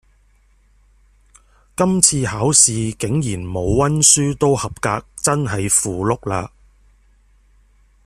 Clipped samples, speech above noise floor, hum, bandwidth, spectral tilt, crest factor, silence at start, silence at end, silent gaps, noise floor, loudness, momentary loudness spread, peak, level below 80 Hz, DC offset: under 0.1%; 38 dB; none; 15.5 kHz; -3.5 dB/octave; 20 dB; 1.8 s; 1.6 s; none; -55 dBFS; -16 LUFS; 12 LU; 0 dBFS; -42 dBFS; under 0.1%